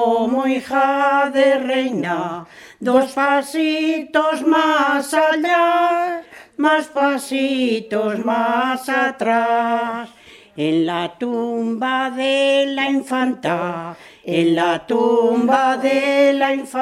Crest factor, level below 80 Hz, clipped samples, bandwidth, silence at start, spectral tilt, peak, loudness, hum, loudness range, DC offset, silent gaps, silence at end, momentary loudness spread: 16 dB; -66 dBFS; under 0.1%; 14 kHz; 0 s; -4.5 dB/octave; -2 dBFS; -18 LUFS; none; 3 LU; under 0.1%; none; 0 s; 8 LU